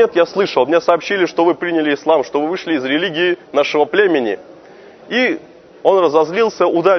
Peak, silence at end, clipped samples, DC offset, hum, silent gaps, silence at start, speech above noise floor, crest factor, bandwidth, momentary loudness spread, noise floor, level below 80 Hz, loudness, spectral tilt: 0 dBFS; 0 s; under 0.1%; under 0.1%; none; none; 0 s; 26 dB; 16 dB; 6.4 kHz; 5 LU; -40 dBFS; -64 dBFS; -15 LUFS; -5 dB/octave